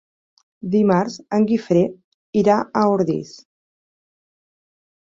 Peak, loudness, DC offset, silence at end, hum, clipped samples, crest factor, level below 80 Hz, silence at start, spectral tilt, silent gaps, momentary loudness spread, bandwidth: -2 dBFS; -19 LUFS; under 0.1%; 1.75 s; none; under 0.1%; 18 dB; -60 dBFS; 0.65 s; -7.5 dB/octave; 2.04-2.33 s; 8 LU; 7.6 kHz